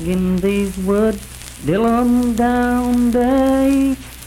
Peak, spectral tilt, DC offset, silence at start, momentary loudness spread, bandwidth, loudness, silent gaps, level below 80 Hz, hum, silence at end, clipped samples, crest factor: -6 dBFS; -6.5 dB/octave; under 0.1%; 0 s; 6 LU; 16.5 kHz; -16 LUFS; none; -34 dBFS; none; 0 s; under 0.1%; 10 dB